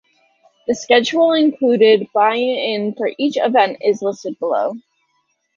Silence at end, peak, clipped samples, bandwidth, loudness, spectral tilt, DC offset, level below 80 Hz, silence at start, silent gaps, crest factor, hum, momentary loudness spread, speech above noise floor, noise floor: 0.8 s; -2 dBFS; under 0.1%; 7.4 kHz; -16 LUFS; -4.5 dB/octave; under 0.1%; -66 dBFS; 0.7 s; none; 16 dB; none; 11 LU; 51 dB; -67 dBFS